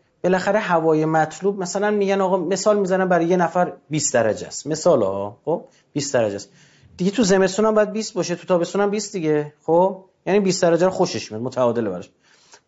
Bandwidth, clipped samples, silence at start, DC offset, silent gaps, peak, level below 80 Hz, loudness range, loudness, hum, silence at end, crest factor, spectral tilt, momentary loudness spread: 8 kHz; under 0.1%; 0.25 s; under 0.1%; none; -6 dBFS; -60 dBFS; 2 LU; -20 LUFS; none; 0.6 s; 14 dB; -5 dB/octave; 9 LU